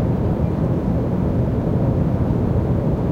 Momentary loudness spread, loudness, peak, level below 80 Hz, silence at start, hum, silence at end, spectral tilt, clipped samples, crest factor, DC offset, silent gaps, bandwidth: 1 LU; -20 LUFS; -6 dBFS; -28 dBFS; 0 s; none; 0 s; -10.5 dB/octave; under 0.1%; 12 dB; under 0.1%; none; 6.4 kHz